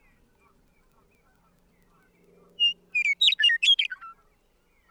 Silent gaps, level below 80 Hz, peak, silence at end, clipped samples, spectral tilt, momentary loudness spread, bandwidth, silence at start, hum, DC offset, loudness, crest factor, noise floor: none; -68 dBFS; -10 dBFS; 0.8 s; under 0.1%; 3 dB/octave; 9 LU; 13.5 kHz; 2.6 s; none; under 0.1%; -21 LUFS; 20 dB; -66 dBFS